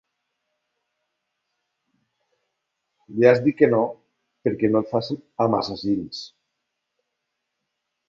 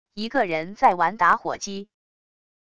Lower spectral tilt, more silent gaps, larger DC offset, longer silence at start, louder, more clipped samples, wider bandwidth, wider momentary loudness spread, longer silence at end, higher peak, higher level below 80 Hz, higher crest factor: first, -7.5 dB/octave vs -4 dB/octave; neither; second, under 0.1% vs 0.5%; first, 3.1 s vs 0.15 s; about the same, -21 LUFS vs -22 LUFS; neither; second, 7.4 kHz vs 11 kHz; first, 16 LU vs 12 LU; first, 1.8 s vs 0.75 s; about the same, -2 dBFS vs -4 dBFS; about the same, -62 dBFS vs -60 dBFS; about the same, 22 dB vs 20 dB